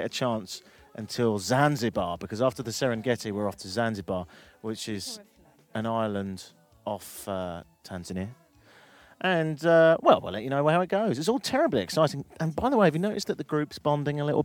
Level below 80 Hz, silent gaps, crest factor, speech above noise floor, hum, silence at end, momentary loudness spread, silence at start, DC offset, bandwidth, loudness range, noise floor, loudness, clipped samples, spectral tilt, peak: -60 dBFS; none; 22 dB; 30 dB; none; 0 s; 16 LU; 0 s; under 0.1%; 18.5 kHz; 10 LU; -57 dBFS; -27 LUFS; under 0.1%; -5.5 dB/octave; -6 dBFS